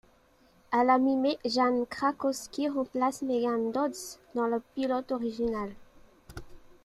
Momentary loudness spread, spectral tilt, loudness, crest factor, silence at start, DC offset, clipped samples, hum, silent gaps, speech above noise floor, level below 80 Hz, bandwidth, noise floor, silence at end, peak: 14 LU; -4 dB/octave; -29 LUFS; 18 dB; 0.7 s; under 0.1%; under 0.1%; none; none; 34 dB; -60 dBFS; 14 kHz; -63 dBFS; 0.1 s; -12 dBFS